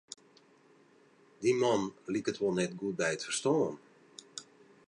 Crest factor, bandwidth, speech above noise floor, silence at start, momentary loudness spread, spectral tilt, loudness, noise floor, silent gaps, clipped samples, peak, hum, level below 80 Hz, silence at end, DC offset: 18 dB; 11 kHz; 32 dB; 1.4 s; 21 LU; -4.5 dB/octave; -32 LUFS; -63 dBFS; none; under 0.1%; -16 dBFS; none; -76 dBFS; 0.45 s; under 0.1%